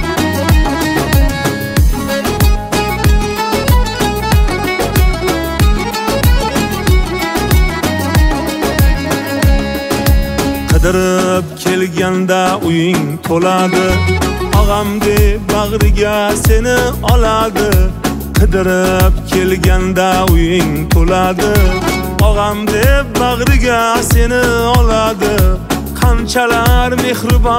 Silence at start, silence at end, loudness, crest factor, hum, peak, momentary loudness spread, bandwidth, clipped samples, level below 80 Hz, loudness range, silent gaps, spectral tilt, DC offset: 0 s; 0 s; -12 LUFS; 12 dB; none; 0 dBFS; 4 LU; 16.5 kHz; under 0.1%; -16 dBFS; 2 LU; none; -5.5 dB/octave; under 0.1%